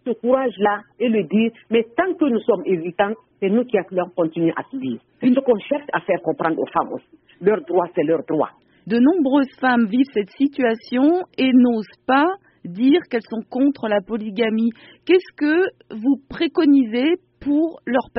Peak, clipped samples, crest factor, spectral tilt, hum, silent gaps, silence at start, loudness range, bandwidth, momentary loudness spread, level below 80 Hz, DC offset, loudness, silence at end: -4 dBFS; under 0.1%; 16 dB; -4.5 dB/octave; none; none; 0.05 s; 3 LU; 5.8 kHz; 8 LU; -60 dBFS; under 0.1%; -20 LUFS; 0 s